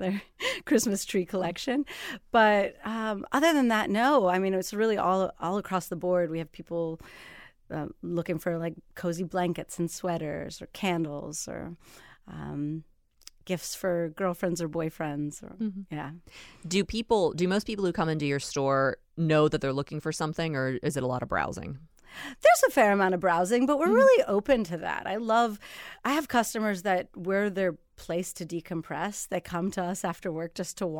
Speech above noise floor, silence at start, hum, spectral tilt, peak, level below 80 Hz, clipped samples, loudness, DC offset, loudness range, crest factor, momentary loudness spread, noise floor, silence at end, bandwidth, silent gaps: 28 dB; 0 s; none; -5 dB/octave; -10 dBFS; -56 dBFS; under 0.1%; -28 LUFS; under 0.1%; 10 LU; 18 dB; 14 LU; -56 dBFS; 0 s; 18 kHz; none